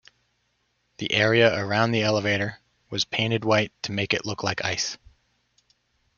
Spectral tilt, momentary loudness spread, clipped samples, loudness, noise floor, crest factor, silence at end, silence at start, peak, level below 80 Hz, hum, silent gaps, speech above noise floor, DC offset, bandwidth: -4.5 dB/octave; 10 LU; under 0.1%; -24 LUFS; -72 dBFS; 22 dB; 1.2 s; 1 s; -4 dBFS; -60 dBFS; 60 Hz at -60 dBFS; none; 48 dB; under 0.1%; 7.2 kHz